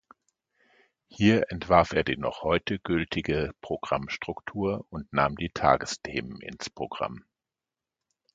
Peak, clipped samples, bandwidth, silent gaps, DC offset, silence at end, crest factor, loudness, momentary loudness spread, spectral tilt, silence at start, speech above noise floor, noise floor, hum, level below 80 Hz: -4 dBFS; under 0.1%; 9.2 kHz; none; under 0.1%; 1.15 s; 26 dB; -28 LUFS; 12 LU; -5.5 dB/octave; 1.1 s; 63 dB; -90 dBFS; none; -50 dBFS